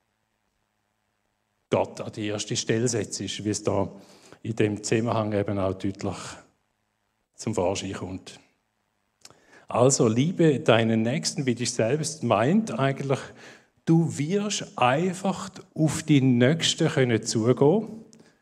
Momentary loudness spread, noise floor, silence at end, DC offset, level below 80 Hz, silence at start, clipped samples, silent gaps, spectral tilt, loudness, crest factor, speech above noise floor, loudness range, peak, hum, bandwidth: 13 LU; -75 dBFS; 0.4 s; under 0.1%; -66 dBFS; 1.7 s; under 0.1%; none; -5 dB/octave; -25 LUFS; 22 dB; 51 dB; 8 LU; -4 dBFS; none; 13.5 kHz